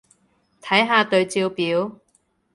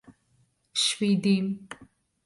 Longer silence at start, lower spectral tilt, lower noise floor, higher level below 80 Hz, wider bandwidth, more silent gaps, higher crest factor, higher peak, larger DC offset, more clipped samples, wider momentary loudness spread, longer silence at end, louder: about the same, 0.65 s vs 0.75 s; about the same, -4 dB/octave vs -4.5 dB/octave; about the same, -65 dBFS vs -68 dBFS; about the same, -68 dBFS vs -70 dBFS; about the same, 11.5 kHz vs 11.5 kHz; neither; about the same, 20 dB vs 16 dB; first, -2 dBFS vs -12 dBFS; neither; neither; second, 11 LU vs 20 LU; first, 0.65 s vs 0.4 s; first, -20 LUFS vs -26 LUFS